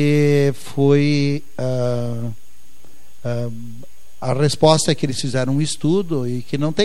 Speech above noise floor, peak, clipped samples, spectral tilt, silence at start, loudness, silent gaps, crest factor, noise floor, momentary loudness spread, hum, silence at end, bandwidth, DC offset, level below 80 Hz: 33 dB; 0 dBFS; under 0.1%; -6 dB/octave; 0 s; -19 LUFS; none; 20 dB; -51 dBFS; 14 LU; none; 0 s; 13.5 kHz; 5%; -54 dBFS